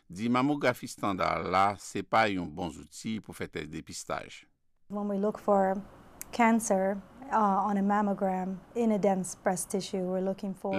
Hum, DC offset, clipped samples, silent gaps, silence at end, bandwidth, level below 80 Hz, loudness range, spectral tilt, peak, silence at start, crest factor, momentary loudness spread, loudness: none; under 0.1%; under 0.1%; none; 0 s; 15 kHz; -62 dBFS; 6 LU; -5 dB/octave; -12 dBFS; 0.1 s; 18 dB; 12 LU; -30 LUFS